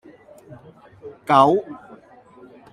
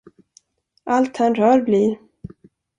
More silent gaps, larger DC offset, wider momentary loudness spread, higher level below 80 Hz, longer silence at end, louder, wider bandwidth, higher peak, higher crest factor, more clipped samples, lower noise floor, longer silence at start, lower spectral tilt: neither; neither; first, 27 LU vs 14 LU; about the same, -64 dBFS vs -60 dBFS; first, 0.95 s vs 0.5 s; about the same, -17 LUFS vs -18 LUFS; first, 12.5 kHz vs 10 kHz; about the same, -2 dBFS vs -4 dBFS; first, 22 dB vs 16 dB; neither; second, -48 dBFS vs -57 dBFS; first, 1.05 s vs 0.85 s; about the same, -6.5 dB/octave vs -7 dB/octave